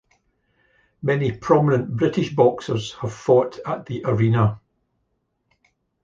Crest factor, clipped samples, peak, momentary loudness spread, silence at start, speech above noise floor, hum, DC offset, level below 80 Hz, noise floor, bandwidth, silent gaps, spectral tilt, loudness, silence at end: 20 dB; under 0.1%; -2 dBFS; 10 LU; 1.05 s; 52 dB; none; under 0.1%; -54 dBFS; -72 dBFS; 7.6 kHz; none; -7.5 dB/octave; -21 LUFS; 1.45 s